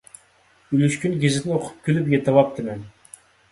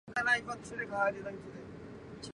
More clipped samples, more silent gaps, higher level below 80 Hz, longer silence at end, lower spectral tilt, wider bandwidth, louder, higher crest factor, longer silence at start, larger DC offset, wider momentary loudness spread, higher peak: neither; neither; first, -58 dBFS vs -64 dBFS; first, 0.6 s vs 0 s; first, -6.5 dB/octave vs -4 dB/octave; about the same, 11.5 kHz vs 11 kHz; first, -21 LUFS vs -34 LUFS; about the same, 20 dB vs 20 dB; first, 0.7 s vs 0.05 s; neither; second, 13 LU vs 18 LU; first, -2 dBFS vs -16 dBFS